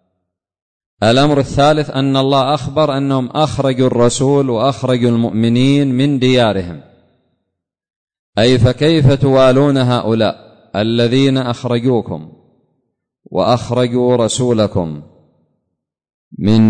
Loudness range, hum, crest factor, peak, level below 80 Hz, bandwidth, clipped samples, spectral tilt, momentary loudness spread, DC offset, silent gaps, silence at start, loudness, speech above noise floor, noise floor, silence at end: 4 LU; none; 12 dB; -2 dBFS; -42 dBFS; 9.6 kHz; under 0.1%; -6.5 dB/octave; 9 LU; under 0.1%; 7.96-8.07 s, 8.19-8.33 s, 16.14-16.31 s; 1 s; -13 LUFS; 62 dB; -75 dBFS; 0 s